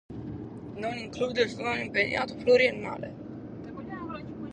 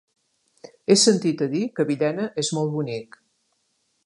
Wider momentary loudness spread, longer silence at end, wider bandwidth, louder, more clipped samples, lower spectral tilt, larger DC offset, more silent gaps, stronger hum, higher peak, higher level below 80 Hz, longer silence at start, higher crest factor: first, 18 LU vs 13 LU; second, 0 s vs 1 s; second, 9.4 kHz vs 11.5 kHz; second, -28 LUFS vs -22 LUFS; neither; about the same, -5 dB/octave vs -4 dB/octave; neither; neither; neither; second, -10 dBFS vs -2 dBFS; first, -56 dBFS vs -72 dBFS; second, 0.1 s vs 0.9 s; about the same, 20 dB vs 22 dB